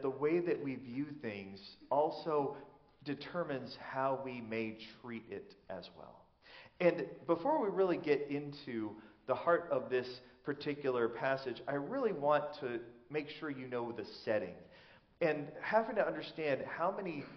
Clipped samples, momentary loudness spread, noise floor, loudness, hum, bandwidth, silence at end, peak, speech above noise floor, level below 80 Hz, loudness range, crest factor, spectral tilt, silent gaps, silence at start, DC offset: under 0.1%; 15 LU; -62 dBFS; -37 LUFS; none; 6.2 kHz; 0 s; -16 dBFS; 25 dB; -76 dBFS; 5 LU; 22 dB; -4.5 dB/octave; none; 0 s; under 0.1%